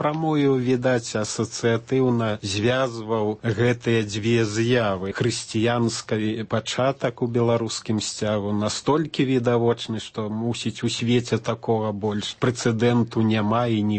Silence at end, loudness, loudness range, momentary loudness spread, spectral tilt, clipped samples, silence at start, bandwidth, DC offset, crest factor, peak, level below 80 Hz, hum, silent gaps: 0 s; -23 LUFS; 1 LU; 5 LU; -5.5 dB/octave; under 0.1%; 0 s; 8.8 kHz; under 0.1%; 16 dB; -8 dBFS; -58 dBFS; none; none